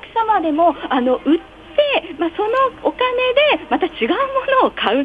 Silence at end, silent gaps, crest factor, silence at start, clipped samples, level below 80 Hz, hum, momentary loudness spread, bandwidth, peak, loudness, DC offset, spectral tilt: 0 s; none; 16 dB; 0.05 s; under 0.1%; -50 dBFS; none; 5 LU; 7.4 kHz; -2 dBFS; -17 LUFS; under 0.1%; -5.5 dB/octave